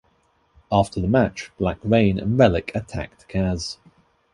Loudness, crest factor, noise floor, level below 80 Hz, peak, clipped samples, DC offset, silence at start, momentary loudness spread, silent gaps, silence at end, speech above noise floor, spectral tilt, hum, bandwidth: -22 LUFS; 20 dB; -63 dBFS; -40 dBFS; -2 dBFS; under 0.1%; under 0.1%; 0.7 s; 13 LU; none; 0.6 s; 43 dB; -7 dB/octave; none; 11.5 kHz